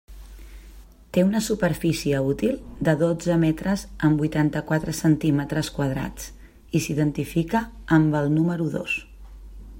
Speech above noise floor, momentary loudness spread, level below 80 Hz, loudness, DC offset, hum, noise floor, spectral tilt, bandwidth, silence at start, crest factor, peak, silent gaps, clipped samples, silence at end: 23 dB; 6 LU; -44 dBFS; -23 LUFS; under 0.1%; none; -46 dBFS; -6.5 dB/octave; 16.5 kHz; 0.1 s; 18 dB; -6 dBFS; none; under 0.1%; 0 s